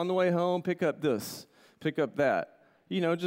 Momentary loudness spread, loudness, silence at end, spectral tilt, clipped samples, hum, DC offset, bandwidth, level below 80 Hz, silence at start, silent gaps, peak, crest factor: 11 LU; -30 LUFS; 0 s; -6 dB/octave; under 0.1%; none; under 0.1%; 16 kHz; -76 dBFS; 0 s; none; -16 dBFS; 14 dB